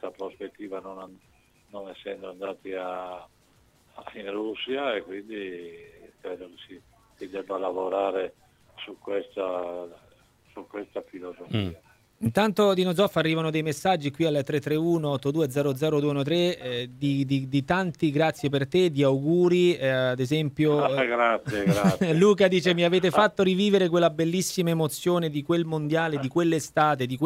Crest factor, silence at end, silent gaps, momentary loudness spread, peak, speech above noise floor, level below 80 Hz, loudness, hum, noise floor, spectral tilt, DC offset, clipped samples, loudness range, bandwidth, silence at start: 20 dB; 0 s; none; 18 LU; -6 dBFS; 36 dB; -62 dBFS; -25 LUFS; none; -61 dBFS; -6 dB/octave; under 0.1%; under 0.1%; 13 LU; 16 kHz; 0.05 s